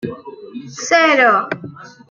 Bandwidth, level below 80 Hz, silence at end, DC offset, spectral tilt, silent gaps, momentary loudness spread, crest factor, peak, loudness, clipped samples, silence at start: 7.6 kHz; -64 dBFS; 0.2 s; under 0.1%; -3 dB/octave; none; 23 LU; 16 dB; 0 dBFS; -13 LUFS; under 0.1%; 0.05 s